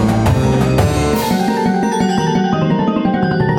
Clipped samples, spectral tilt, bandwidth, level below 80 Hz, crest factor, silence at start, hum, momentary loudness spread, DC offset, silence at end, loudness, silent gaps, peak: under 0.1%; -6.5 dB/octave; 17 kHz; -30 dBFS; 12 dB; 0 s; none; 2 LU; under 0.1%; 0 s; -15 LUFS; none; -2 dBFS